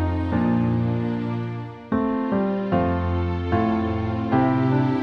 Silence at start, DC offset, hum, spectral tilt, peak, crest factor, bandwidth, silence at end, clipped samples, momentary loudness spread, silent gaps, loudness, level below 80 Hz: 0 s; under 0.1%; none; -10 dB/octave; -8 dBFS; 14 dB; 6.2 kHz; 0 s; under 0.1%; 6 LU; none; -23 LUFS; -40 dBFS